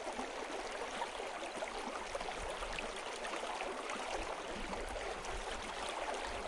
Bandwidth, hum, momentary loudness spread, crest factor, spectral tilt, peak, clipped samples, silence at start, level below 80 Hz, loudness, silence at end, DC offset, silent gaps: 11.5 kHz; none; 2 LU; 16 dB; -2.5 dB/octave; -26 dBFS; under 0.1%; 0 s; -54 dBFS; -42 LUFS; 0 s; under 0.1%; none